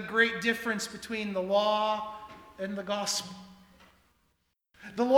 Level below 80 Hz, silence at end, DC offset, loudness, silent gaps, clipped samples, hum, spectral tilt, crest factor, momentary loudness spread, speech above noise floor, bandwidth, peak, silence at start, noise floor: -68 dBFS; 0 s; under 0.1%; -30 LUFS; none; under 0.1%; none; -3 dB/octave; 22 dB; 19 LU; 45 dB; 19.5 kHz; -10 dBFS; 0 s; -75 dBFS